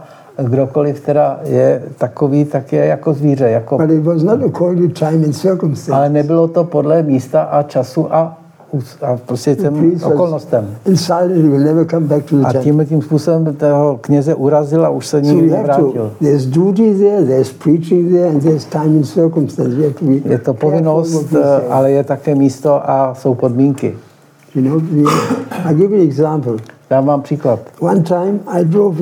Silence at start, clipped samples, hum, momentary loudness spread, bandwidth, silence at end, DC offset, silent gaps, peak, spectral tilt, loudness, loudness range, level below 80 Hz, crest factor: 0 s; under 0.1%; none; 5 LU; 15 kHz; 0 s; under 0.1%; none; 0 dBFS; -8 dB/octave; -13 LUFS; 3 LU; -62 dBFS; 12 dB